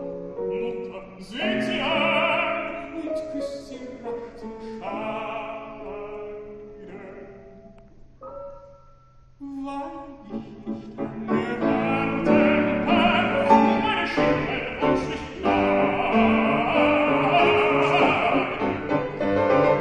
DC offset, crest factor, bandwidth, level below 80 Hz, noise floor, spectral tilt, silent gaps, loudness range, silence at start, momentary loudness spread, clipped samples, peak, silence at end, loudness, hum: under 0.1%; 20 dB; 10 kHz; -50 dBFS; -52 dBFS; -6.5 dB/octave; none; 19 LU; 0 s; 19 LU; under 0.1%; -4 dBFS; 0 s; -22 LUFS; none